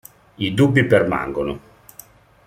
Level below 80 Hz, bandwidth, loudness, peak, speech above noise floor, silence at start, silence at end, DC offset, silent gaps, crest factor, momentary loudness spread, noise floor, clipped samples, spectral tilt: -48 dBFS; 16 kHz; -19 LUFS; -2 dBFS; 29 dB; 0.4 s; 0.9 s; under 0.1%; none; 18 dB; 12 LU; -46 dBFS; under 0.1%; -7 dB/octave